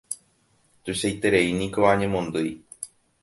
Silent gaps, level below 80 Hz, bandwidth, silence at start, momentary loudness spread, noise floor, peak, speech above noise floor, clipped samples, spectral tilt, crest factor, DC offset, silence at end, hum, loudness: none; -52 dBFS; 12 kHz; 0.1 s; 18 LU; -64 dBFS; -4 dBFS; 41 dB; under 0.1%; -4.5 dB/octave; 20 dB; under 0.1%; 0.35 s; none; -23 LUFS